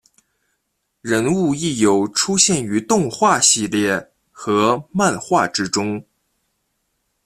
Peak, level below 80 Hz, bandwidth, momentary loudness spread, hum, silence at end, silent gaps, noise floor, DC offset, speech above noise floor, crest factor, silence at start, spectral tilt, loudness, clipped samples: 0 dBFS; -56 dBFS; 14.5 kHz; 8 LU; none; 1.25 s; none; -72 dBFS; under 0.1%; 55 dB; 20 dB; 1.05 s; -3.5 dB/octave; -17 LUFS; under 0.1%